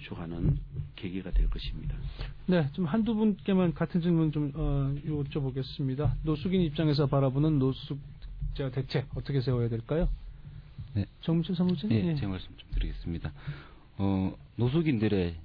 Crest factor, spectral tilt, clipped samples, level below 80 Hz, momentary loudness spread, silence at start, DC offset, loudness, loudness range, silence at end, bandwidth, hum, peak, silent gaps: 14 dB; -10.5 dB/octave; under 0.1%; -38 dBFS; 13 LU; 0 s; under 0.1%; -30 LUFS; 4 LU; 0 s; 5.2 kHz; none; -14 dBFS; none